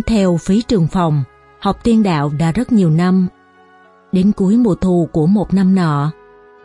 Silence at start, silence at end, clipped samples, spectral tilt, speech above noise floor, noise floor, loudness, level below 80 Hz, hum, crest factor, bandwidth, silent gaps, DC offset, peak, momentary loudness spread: 0 s; 0.55 s; under 0.1%; -8 dB/octave; 33 dB; -47 dBFS; -15 LUFS; -36 dBFS; none; 12 dB; 11 kHz; none; under 0.1%; -2 dBFS; 7 LU